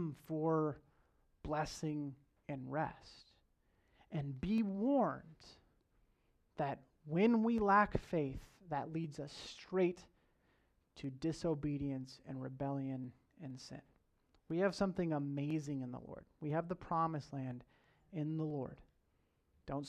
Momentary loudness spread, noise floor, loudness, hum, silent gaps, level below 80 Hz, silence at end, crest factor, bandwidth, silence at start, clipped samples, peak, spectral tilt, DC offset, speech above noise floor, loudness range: 18 LU; -78 dBFS; -39 LUFS; none; none; -64 dBFS; 0 s; 22 dB; 13 kHz; 0 s; under 0.1%; -18 dBFS; -7 dB/octave; under 0.1%; 39 dB; 7 LU